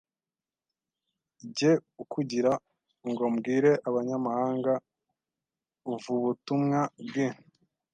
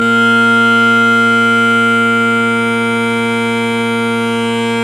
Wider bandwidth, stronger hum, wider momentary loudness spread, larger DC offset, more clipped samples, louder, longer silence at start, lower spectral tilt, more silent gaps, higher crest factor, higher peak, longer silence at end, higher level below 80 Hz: second, 9.2 kHz vs 13.5 kHz; neither; first, 13 LU vs 6 LU; neither; neither; second, -29 LUFS vs -11 LUFS; first, 1.45 s vs 0 s; first, -6.5 dB/octave vs -4.5 dB/octave; neither; first, 18 dB vs 10 dB; second, -12 dBFS vs 0 dBFS; first, 0.6 s vs 0 s; second, -78 dBFS vs -58 dBFS